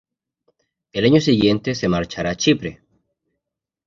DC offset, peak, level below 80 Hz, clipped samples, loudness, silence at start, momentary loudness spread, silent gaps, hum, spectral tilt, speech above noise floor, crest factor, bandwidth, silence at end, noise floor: under 0.1%; -2 dBFS; -48 dBFS; under 0.1%; -18 LUFS; 0.95 s; 10 LU; none; none; -5.5 dB/octave; 65 dB; 18 dB; 7.6 kHz; 1.15 s; -83 dBFS